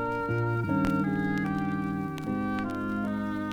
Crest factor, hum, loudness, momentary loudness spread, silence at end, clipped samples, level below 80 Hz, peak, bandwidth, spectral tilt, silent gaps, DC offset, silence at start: 18 dB; none; -30 LUFS; 5 LU; 0 s; under 0.1%; -52 dBFS; -12 dBFS; 17 kHz; -8 dB/octave; none; under 0.1%; 0 s